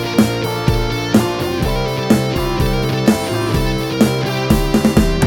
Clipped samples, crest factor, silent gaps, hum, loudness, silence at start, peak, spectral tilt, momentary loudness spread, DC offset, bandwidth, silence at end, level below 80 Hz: under 0.1%; 16 dB; none; none; -16 LUFS; 0 s; 0 dBFS; -6 dB/octave; 4 LU; under 0.1%; 19 kHz; 0 s; -26 dBFS